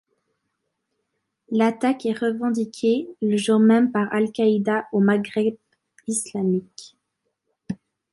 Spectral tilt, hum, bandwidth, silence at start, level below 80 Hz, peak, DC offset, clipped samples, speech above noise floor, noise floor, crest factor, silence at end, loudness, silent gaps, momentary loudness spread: -5.5 dB/octave; none; 11.5 kHz; 1.5 s; -70 dBFS; -6 dBFS; under 0.1%; under 0.1%; 56 dB; -77 dBFS; 16 dB; 0.4 s; -22 LUFS; none; 13 LU